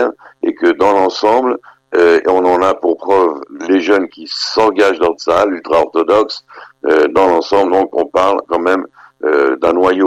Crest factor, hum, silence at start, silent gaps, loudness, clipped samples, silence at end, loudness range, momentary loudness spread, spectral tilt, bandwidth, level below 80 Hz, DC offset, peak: 10 dB; none; 0 s; none; -13 LUFS; under 0.1%; 0 s; 1 LU; 9 LU; -4.5 dB/octave; 10.5 kHz; -50 dBFS; under 0.1%; -2 dBFS